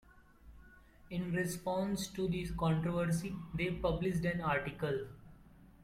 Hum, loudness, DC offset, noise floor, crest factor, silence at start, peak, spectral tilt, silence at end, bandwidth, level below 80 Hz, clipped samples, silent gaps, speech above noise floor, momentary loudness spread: none; -36 LUFS; under 0.1%; -59 dBFS; 16 dB; 0.15 s; -20 dBFS; -6 dB/octave; 0 s; 15.5 kHz; -54 dBFS; under 0.1%; none; 24 dB; 7 LU